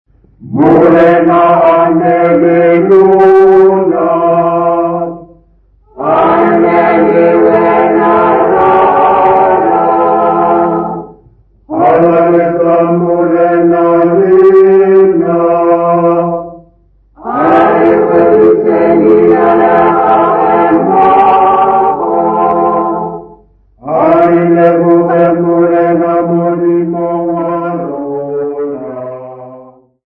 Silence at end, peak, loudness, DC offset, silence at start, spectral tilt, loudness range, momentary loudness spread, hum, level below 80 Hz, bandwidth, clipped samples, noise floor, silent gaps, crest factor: 0.45 s; 0 dBFS; -8 LUFS; under 0.1%; 0.45 s; -10 dB/octave; 4 LU; 11 LU; none; -44 dBFS; 4.3 kHz; 0.8%; -47 dBFS; none; 8 dB